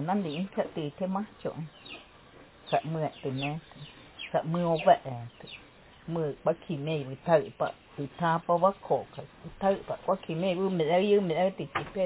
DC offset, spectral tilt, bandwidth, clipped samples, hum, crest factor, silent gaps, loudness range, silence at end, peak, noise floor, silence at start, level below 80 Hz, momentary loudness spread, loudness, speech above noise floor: under 0.1%; -10.5 dB/octave; 4 kHz; under 0.1%; none; 22 dB; none; 6 LU; 0 s; -8 dBFS; -54 dBFS; 0 s; -62 dBFS; 20 LU; -30 LUFS; 25 dB